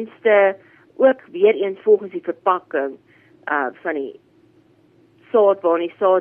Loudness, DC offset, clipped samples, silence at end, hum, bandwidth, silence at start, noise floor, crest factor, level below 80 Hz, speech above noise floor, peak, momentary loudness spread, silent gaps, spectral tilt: -19 LUFS; under 0.1%; under 0.1%; 0 s; none; 3.5 kHz; 0 s; -55 dBFS; 16 dB; -76 dBFS; 37 dB; -4 dBFS; 12 LU; none; -8 dB/octave